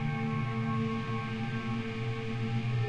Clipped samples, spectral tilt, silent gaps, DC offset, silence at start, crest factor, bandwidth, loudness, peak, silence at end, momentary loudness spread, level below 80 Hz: under 0.1%; -7.5 dB/octave; none; 0.4%; 0 s; 12 dB; 8 kHz; -34 LUFS; -20 dBFS; 0 s; 3 LU; -52 dBFS